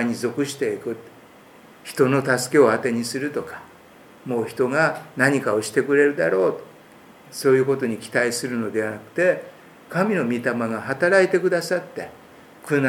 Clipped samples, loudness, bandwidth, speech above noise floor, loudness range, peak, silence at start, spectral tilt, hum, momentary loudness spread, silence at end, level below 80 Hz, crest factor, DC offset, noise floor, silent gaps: under 0.1%; -21 LUFS; 17.5 kHz; 27 dB; 2 LU; -2 dBFS; 0 s; -5 dB/octave; none; 16 LU; 0 s; -70 dBFS; 20 dB; under 0.1%; -48 dBFS; none